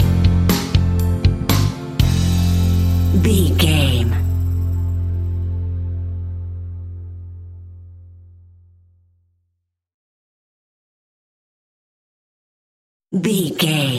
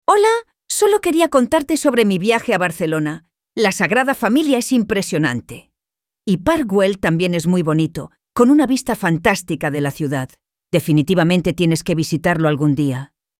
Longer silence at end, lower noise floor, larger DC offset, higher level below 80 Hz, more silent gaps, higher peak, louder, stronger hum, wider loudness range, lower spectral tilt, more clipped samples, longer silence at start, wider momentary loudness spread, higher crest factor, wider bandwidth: second, 0 s vs 0.35 s; second, -73 dBFS vs -87 dBFS; neither; first, -28 dBFS vs -48 dBFS; first, 9.94-13.00 s vs none; about the same, -2 dBFS vs 0 dBFS; about the same, -18 LUFS vs -17 LUFS; neither; first, 18 LU vs 2 LU; about the same, -6 dB/octave vs -5.5 dB/octave; neither; about the same, 0 s vs 0.1 s; first, 17 LU vs 8 LU; about the same, 16 dB vs 16 dB; about the same, 15.5 kHz vs 16.5 kHz